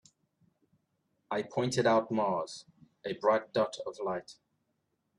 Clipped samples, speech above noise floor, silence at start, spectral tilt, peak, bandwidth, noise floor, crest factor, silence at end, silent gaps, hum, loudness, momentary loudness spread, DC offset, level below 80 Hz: under 0.1%; 49 dB; 1.3 s; -5 dB/octave; -14 dBFS; 11.5 kHz; -80 dBFS; 20 dB; 0.85 s; none; none; -32 LUFS; 13 LU; under 0.1%; -74 dBFS